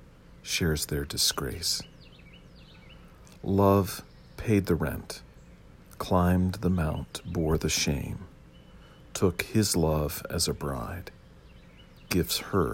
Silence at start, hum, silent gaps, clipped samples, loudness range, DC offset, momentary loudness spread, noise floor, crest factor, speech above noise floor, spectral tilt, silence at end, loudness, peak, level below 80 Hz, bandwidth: 0 s; none; none; under 0.1%; 1 LU; under 0.1%; 15 LU; -52 dBFS; 20 dB; 24 dB; -4.5 dB/octave; 0 s; -28 LUFS; -10 dBFS; -46 dBFS; 16.5 kHz